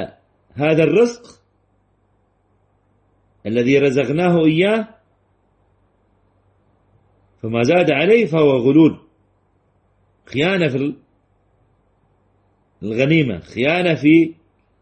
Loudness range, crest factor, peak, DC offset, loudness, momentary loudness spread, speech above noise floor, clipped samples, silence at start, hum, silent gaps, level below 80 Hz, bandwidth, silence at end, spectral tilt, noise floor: 8 LU; 16 dB; -2 dBFS; under 0.1%; -16 LUFS; 17 LU; 46 dB; under 0.1%; 0 s; none; none; -56 dBFS; 8.6 kHz; 0.5 s; -7 dB/octave; -62 dBFS